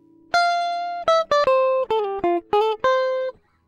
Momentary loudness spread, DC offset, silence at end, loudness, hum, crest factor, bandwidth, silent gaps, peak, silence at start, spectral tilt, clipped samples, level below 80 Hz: 6 LU; under 0.1%; 0.35 s; -21 LUFS; none; 14 dB; 9.6 kHz; none; -8 dBFS; 0.35 s; -3.5 dB/octave; under 0.1%; -58 dBFS